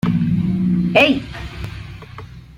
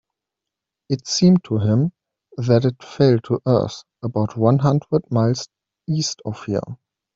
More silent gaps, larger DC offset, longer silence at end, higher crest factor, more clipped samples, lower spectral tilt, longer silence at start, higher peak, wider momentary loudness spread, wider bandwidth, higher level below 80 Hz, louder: neither; neither; second, 0 s vs 0.4 s; about the same, 18 dB vs 18 dB; neither; about the same, -7 dB/octave vs -6.5 dB/octave; second, 0.05 s vs 0.9 s; about the same, -2 dBFS vs -2 dBFS; first, 22 LU vs 12 LU; first, 9.8 kHz vs 7.8 kHz; first, -38 dBFS vs -56 dBFS; first, -16 LUFS vs -20 LUFS